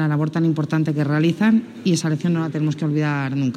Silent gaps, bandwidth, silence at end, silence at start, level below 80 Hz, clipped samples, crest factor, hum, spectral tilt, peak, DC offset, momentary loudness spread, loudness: none; 10.5 kHz; 0 s; 0 s; -68 dBFS; under 0.1%; 12 dB; none; -7 dB/octave; -8 dBFS; under 0.1%; 4 LU; -20 LUFS